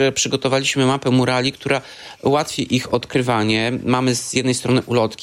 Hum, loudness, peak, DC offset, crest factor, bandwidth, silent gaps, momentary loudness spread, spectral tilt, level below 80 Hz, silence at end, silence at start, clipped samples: none; -19 LUFS; -4 dBFS; under 0.1%; 14 dB; 15.5 kHz; none; 4 LU; -4.5 dB/octave; -54 dBFS; 0 s; 0 s; under 0.1%